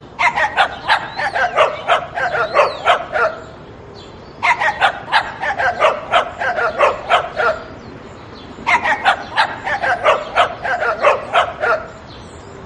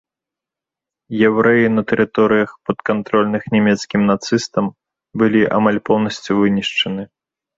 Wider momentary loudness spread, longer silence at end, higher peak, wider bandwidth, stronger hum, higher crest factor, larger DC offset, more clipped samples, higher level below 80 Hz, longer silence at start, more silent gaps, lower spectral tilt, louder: first, 20 LU vs 8 LU; second, 0 s vs 0.55 s; about the same, 0 dBFS vs -2 dBFS; first, 11.5 kHz vs 7.8 kHz; neither; about the same, 18 dB vs 16 dB; neither; neither; first, -46 dBFS vs -54 dBFS; second, 0 s vs 1.1 s; neither; second, -3 dB/octave vs -6 dB/octave; about the same, -16 LUFS vs -16 LUFS